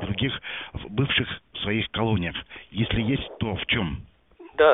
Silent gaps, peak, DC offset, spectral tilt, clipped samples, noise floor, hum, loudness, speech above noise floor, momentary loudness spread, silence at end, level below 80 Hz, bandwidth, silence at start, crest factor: none; -6 dBFS; 0.1%; -4 dB/octave; under 0.1%; -50 dBFS; none; -26 LUFS; 23 dB; 11 LU; 0 s; -44 dBFS; 4 kHz; 0 s; 20 dB